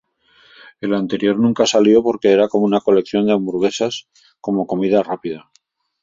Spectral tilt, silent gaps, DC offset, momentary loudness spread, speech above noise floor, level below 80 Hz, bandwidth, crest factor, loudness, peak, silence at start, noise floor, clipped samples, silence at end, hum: -5.5 dB/octave; none; under 0.1%; 13 LU; 37 dB; -58 dBFS; 7.6 kHz; 16 dB; -17 LUFS; -2 dBFS; 0.8 s; -53 dBFS; under 0.1%; 0.6 s; none